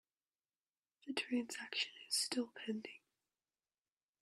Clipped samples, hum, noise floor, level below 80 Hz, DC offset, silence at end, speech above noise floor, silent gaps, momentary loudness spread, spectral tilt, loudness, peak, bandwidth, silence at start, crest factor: under 0.1%; none; under -90 dBFS; under -90 dBFS; under 0.1%; 1.25 s; over 48 dB; none; 16 LU; -1.5 dB/octave; -41 LUFS; -22 dBFS; 14 kHz; 1.05 s; 22 dB